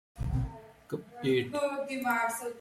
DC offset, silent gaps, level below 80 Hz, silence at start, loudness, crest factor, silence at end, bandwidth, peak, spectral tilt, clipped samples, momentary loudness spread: under 0.1%; none; -44 dBFS; 0.15 s; -32 LUFS; 16 dB; 0 s; 16.5 kHz; -18 dBFS; -5.5 dB/octave; under 0.1%; 12 LU